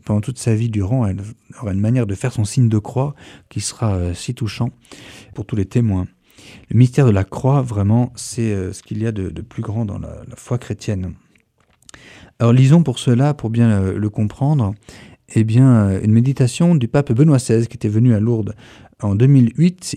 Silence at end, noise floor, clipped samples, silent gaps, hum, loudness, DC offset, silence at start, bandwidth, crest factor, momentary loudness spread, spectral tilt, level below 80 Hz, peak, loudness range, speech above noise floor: 0 s; -58 dBFS; under 0.1%; none; none; -17 LUFS; under 0.1%; 0.05 s; 11.5 kHz; 16 dB; 13 LU; -7.5 dB/octave; -46 dBFS; 0 dBFS; 8 LU; 42 dB